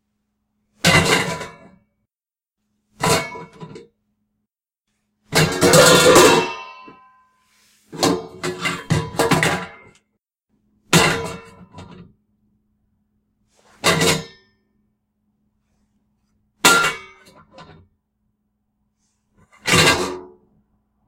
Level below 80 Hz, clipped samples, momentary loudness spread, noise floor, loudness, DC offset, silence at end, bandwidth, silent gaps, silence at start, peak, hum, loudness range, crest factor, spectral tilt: -48 dBFS; under 0.1%; 25 LU; under -90 dBFS; -16 LUFS; under 0.1%; 0.85 s; 16 kHz; none; 0.85 s; 0 dBFS; none; 9 LU; 22 dB; -3 dB/octave